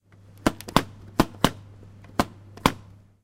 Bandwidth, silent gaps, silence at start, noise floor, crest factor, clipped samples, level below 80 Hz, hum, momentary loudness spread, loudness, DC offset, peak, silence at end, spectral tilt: 16.5 kHz; none; 0.45 s; -48 dBFS; 28 dB; under 0.1%; -42 dBFS; none; 8 LU; -27 LUFS; under 0.1%; 0 dBFS; 0.45 s; -4.5 dB/octave